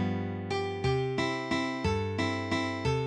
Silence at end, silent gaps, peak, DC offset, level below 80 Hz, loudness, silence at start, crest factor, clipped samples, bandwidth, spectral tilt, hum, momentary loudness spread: 0 s; none; -16 dBFS; under 0.1%; -50 dBFS; -31 LUFS; 0 s; 14 dB; under 0.1%; 10.5 kHz; -6 dB/octave; none; 3 LU